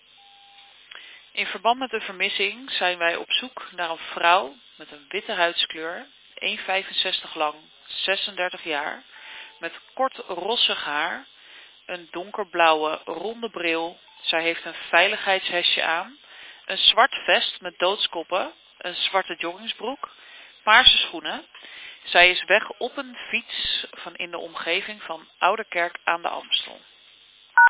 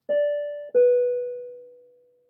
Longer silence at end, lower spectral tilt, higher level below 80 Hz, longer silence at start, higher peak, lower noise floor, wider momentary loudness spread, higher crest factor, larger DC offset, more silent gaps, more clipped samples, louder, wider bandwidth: second, 0 s vs 0.6 s; second, -5.5 dB/octave vs -7 dB/octave; first, -62 dBFS vs -88 dBFS; first, 0.95 s vs 0.1 s; first, 0 dBFS vs -12 dBFS; second, -53 dBFS vs -57 dBFS; about the same, 17 LU vs 17 LU; first, 24 dB vs 14 dB; neither; neither; neither; about the same, -22 LUFS vs -23 LUFS; first, 4 kHz vs 3.1 kHz